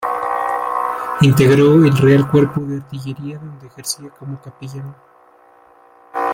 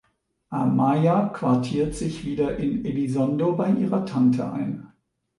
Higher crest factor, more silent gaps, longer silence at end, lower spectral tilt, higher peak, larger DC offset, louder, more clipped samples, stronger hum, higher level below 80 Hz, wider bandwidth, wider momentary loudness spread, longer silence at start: about the same, 16 dB vs 14 dB; neither; second, 0 s vs 0.5 s; second, -6.5 dB/octave vs -8 dB/octave; first, -2 dBFS vs -8 dBFS; neither; first, -15 LUFS vs -23 LUFS; neither; neither; about the same, -50 dBFS vs -48 dBFS; first, 16.5 kHz vs 11.5 kHz; first, 21 LU vs 9 LU; second, 0 s vs 0.5 s